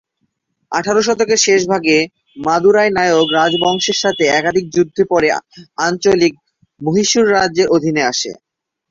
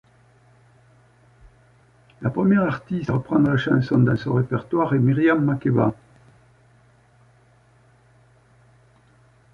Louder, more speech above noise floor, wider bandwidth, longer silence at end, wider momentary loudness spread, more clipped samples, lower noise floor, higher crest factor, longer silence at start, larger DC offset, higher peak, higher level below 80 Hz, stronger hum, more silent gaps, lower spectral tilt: first, -14 LUFS vs -21 LUFS; first, 55 dB vs 36 dB; first, 7.8 kHz vs 6.4 kHz; second, 0.6 s vs 3.6 s; about the same, 9 LU vs 7 LU; neither; first, -69 dBFS vs -56 dBFS; about the same, 14 dB vs 18 dB; second, 0.7 s vs 2.2 s; neither; first, 0 dBFS vs -6 dBFS; about the same, -52 dBFS vs -54 dBFS; neither; neither; second, -3.5 dB/octave vs -9.5 dB/octave